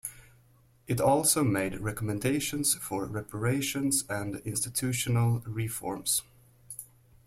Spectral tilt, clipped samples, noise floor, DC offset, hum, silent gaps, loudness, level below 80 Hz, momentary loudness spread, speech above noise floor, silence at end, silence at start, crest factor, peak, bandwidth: -4 dB/octave; under 0.1%; -62 dBFS; under 0.1%; none; none; -29 LUFS; -56 dBFS; 10 LU; 33 dB; 0.4 s; 0.05 s; 20 dB; -10 dBFS; 16.5 kHz